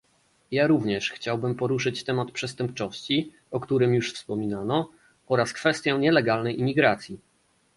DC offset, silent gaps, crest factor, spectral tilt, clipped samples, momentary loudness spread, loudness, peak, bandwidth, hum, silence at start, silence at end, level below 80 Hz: under 0.1%; none; 20 dB; -5.5 dB/octave; under 0.1%; 10 LU; -25 LUFS; -6 dBFS; 11.5 kHz; none; 0.5 s; 0.6 s; -62 dBFS